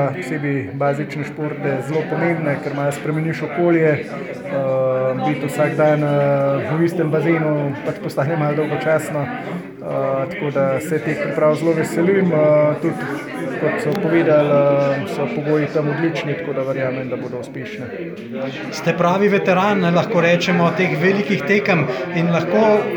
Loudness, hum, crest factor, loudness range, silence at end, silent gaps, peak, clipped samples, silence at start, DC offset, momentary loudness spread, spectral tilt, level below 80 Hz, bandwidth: -18 LUFS; none; 16 dB; 5 LU; 0 s; none; -2 dBFS; under 0.1%; 0 s; under 0.1%; 10 LU; -7 dB/octave; -62 dBFS; over 20 kHz